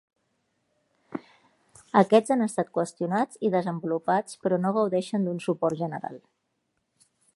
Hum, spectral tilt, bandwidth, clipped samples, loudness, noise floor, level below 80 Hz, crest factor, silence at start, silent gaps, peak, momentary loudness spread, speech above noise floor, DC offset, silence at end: none; -6.5 dB/octave; 11.5 kHz; under 0.1%; -26 LUFS; -77 dBFS; -76 dBFS; 22 dB; 1.1 s; none; -4 dBFS; 16 LU; 51 dB; under 0.1%; 1.2 s